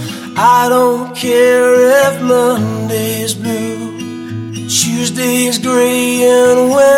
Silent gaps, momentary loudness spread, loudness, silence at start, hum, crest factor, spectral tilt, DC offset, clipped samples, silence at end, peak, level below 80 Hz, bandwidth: none; 13 LU; -11 LUFS; 0 s; none; 12 dB; -4 dB/octave; under 0.1%; under 0.1%; 0 s; 0 dBFS; -56 dBFS; 16.5 kHz